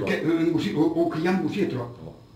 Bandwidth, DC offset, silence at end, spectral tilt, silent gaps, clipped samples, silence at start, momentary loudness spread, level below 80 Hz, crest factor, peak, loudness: 12.5 kHz; under 0.1%; 0.15 s; -7 dB/octave; none; under 0.1%; 0 s; 11 LU; -58 dBFS; 14 dB; -10 dBFS; -24 LUFS